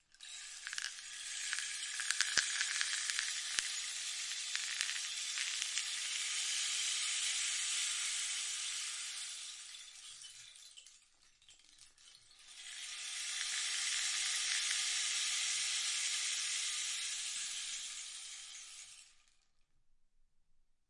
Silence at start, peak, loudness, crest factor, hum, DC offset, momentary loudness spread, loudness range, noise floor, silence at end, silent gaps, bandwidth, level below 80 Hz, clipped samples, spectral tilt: 0.2 s; -8 dBFS; -36 LUFS; 32 dB; none; under 0.1%; 16 LU; 12 LU; -71 dBFS; 1.8 s; none; 11.5 kHz; -80 dBFS; under 0.1%; 5 dB/octave